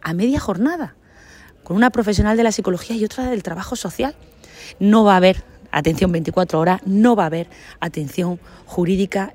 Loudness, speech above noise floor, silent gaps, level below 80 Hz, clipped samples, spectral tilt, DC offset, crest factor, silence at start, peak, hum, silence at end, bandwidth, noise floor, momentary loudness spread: -18 LUFS; 27 dB; none; -38 dBFS; under 0.1%; -6 dB/octave; under 0.1%; 18 dB; 0.05 s; 0 dBFS; none; 0.05 s; 16 kHz; -45 dBFS; 13 LU